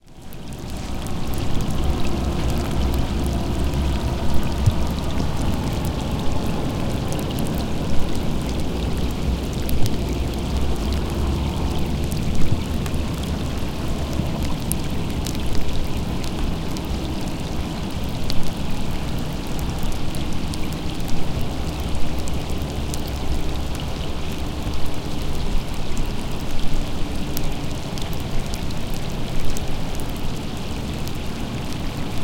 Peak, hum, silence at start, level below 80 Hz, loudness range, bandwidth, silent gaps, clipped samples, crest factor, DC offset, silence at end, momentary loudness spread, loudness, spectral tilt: 0 dBFS; none; 0.05 s; -26 dBFS; 4 LU; 17 kHz; none; under 0.1%; 20 dB; under 0.1%; 0 s; 5 LU; -26 LUFS; -5.5 dB/octave